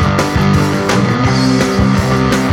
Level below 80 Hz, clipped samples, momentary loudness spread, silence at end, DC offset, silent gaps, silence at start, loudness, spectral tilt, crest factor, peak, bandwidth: -26 dBFS; under 0.1%; 1 LU; 0 s; under 0.1%; none; 0 s; -12 LUFS; -6 dB/octave; 12 dB; 0 dBFS; 17 kHz